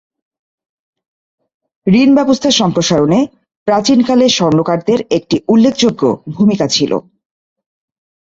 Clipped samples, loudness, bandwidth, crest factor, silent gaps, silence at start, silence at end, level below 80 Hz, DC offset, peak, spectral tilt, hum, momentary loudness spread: under 0.1%; -12 LUFS; 8 kHz; 12 dB; 3.57-3.66 s; 1.85 s; 1.3 s; -50 dBFS; under 0.1%; 0 dBFS; -5 dB/octave; none; 6 LU